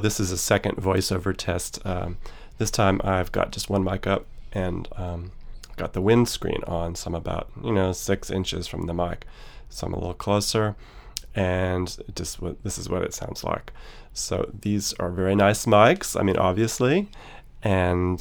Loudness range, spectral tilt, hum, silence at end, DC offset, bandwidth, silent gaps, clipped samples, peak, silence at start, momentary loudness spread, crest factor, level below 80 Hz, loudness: 7 LU; -5 dB/octave; none; 0 s; under 0.1%; over 20 kHz; none; under 0.1%; -2 dBFS; 0 s; 13 LU; 22 dB; -40 dBFS; -25 LUFS